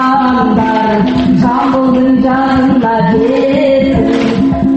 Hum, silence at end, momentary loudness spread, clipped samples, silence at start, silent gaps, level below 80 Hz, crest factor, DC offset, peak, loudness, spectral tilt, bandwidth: none; 0 s; 1 LU; under 0.1%; 0 s; none; -32 dBFS; 10 dB; under 0.1%; 0 dBFS; -10 LUFS; -8 dB/octave; 7.8 kHz